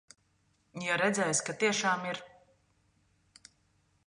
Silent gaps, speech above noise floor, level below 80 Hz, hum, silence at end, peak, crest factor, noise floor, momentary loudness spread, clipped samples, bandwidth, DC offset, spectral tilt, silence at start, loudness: none; 42 dB; -76 dBFS; none; 1.8 s; -14 dBFS; 20 dB; -72 dBFS; 12 LU; under 0.1%; 11 kHz; under 0.1%; -2.5 dB/octave; 0.75 s; -30 LUFS